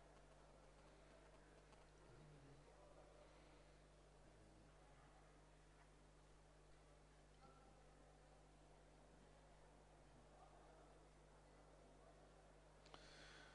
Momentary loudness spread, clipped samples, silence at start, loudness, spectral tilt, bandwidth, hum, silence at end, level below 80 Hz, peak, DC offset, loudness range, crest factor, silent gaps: 4 LU; under 0.1%; 0 s; -68 LUFS; -4.5 dB/octave; 10 kHz; 50 Hz at -70 dBFS; 0 s; -74 dBFS; -40 dBFS; under 0.1%; 2 LU; 28 dB; none